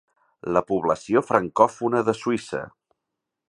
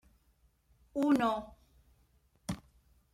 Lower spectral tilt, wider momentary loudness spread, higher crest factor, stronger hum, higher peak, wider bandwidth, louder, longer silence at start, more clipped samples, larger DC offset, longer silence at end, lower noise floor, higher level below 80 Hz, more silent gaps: about the same, -6 dB/octave vs -6 dB/octave; second, 13 LU vs 18 LU; about the same, 22 dB vs 20 dB; neither; first, -2 dBFS vs -18 dBFS; second, 11 kHz vs 15.5 kHz; first, -23 LUFS vs -34 LUFS; second, 0.45 s vs 0.95 s; neither; neither; first, 0.8 s vs 0.55 s; first, -83 dBFS vs -70 dBFS; about the same, -60 dBFS vs -62 dBFS; neither